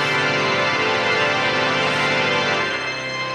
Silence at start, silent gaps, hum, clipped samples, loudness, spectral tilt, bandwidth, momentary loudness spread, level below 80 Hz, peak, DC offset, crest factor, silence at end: 0 s; none; none; under 0.1%; -18 LUFS; -3.5 dB/octave; 13.5 kHz; 4 LU; -56 dBFS; -6 dBFS; under 0.1%; 14 dB; 0 s